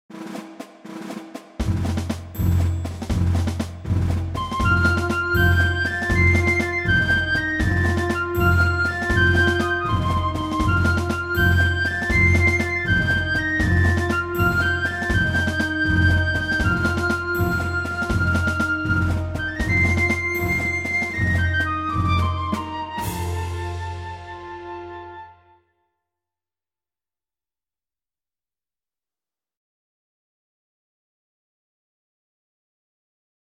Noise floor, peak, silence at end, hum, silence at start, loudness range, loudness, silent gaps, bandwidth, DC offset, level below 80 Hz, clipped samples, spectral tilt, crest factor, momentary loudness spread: under -90 dBFS; -6 dBFS; 8.3 s; none; 0.1 s; 8 LU; -21 LUFS; none; 14 kHz; under 0.1%; -34 dBFS; under 0.1%; -6 dB/octave; 16 dB; 14 LU